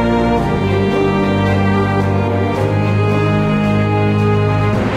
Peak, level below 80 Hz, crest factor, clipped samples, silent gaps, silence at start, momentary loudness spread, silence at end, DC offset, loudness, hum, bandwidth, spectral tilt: -4 dBFS; -32 dBFS; 10 dB; under 0.1%; none; 0 s; 2 LU; 0 s; under 0.1%; -15 LUFS; none; 9.6 kHz; -8 dB/octave